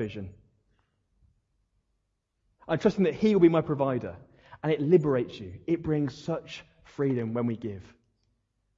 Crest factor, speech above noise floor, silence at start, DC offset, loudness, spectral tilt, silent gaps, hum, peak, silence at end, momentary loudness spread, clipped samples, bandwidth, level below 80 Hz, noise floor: 20 dB; 51 dB; 0 s; under 0.1%; -27 LUFS; -8 dB/octave; none; none; -8 dBFS; 0.95 s; 19 LU; under 0.1%; 7.4 kHz; -62 dBFS; -78 dBFS